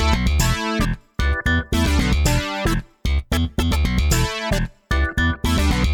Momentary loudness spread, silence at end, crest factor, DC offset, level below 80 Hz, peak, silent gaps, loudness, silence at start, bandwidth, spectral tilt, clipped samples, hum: 6 LU; 0 s; 16 dB; under 0.1%; -22 dBFS; -4 dBFS; none; -21 LUFS; 0 s; 19.5 kHz; -5 dB/octave; under 0.1%; none